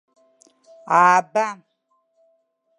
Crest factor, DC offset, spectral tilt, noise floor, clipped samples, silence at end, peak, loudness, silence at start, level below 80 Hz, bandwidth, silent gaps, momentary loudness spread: 20 dB; under 0.1%; -4 dB/octave; -69 dBFS; under 0.1%; 1.25 s; -2 dBFS; -18 LUFS; 0.85 s; -82 dBFS; 11 kHz; none; 14 LU